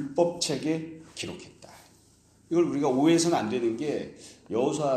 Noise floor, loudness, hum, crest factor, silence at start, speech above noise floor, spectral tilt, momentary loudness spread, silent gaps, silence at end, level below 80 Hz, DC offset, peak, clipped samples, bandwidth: -60 dBFS; -27 LUFS; none; 18 dB; 0 s; 33 dB; -5 dB/octave; 19 LU; none; 0 s; -66 dBFS; under 0.1%; -10 dBFS; under 0.1%; 13.5 kHz